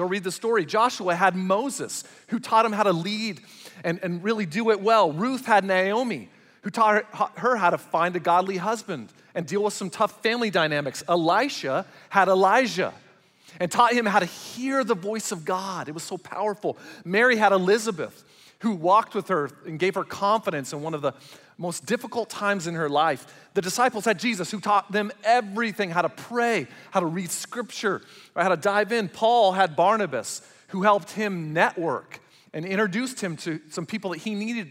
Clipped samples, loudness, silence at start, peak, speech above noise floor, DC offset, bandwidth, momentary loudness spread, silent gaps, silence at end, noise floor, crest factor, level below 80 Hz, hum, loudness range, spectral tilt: under 0.1%; -24 LUFS; 0 s; -6 dBFS; 30 dB; under 0.1%; 16 kHz; 12 LU; none; 0 s; -55 dBFS; 20 dB; -76 dBFS; none; 4 LU; -4.5 dB/octave